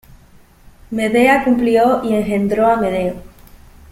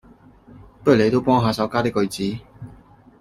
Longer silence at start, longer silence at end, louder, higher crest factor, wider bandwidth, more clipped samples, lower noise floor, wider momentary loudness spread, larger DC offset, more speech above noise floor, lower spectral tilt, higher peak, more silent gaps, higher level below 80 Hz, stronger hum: first, 0.9 s vs 0.6 s; first, 0.7 s vs 0.5 s; first, -15 LUFS vs -20 LUFS; about the same, 16 dB vs 18 dB; about the same, 16 kHz vs 16 kHz; neither; about the same, -46 dBFS vs -48 dBFS; second, 10 LU vs 24 LU; neither; about the same, 32 dB vs 30 dB; about the same, -6 dB/octave vs -6.5 dB/octave; about the same, 0 dBFS vs -2 dBFS; neither; first, -44 dBFS vs -50 dBFS; neither